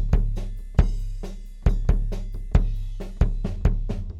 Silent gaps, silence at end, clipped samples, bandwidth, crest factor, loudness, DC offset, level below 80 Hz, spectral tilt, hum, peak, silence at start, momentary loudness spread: none; 0 s; under 0.1%; 7.2 kHz; 20 dB; -27 LUFS; under 0.1%; -24 dBFS; -8 dB/octave; none; -2 dBFS; 0 s; 10 LU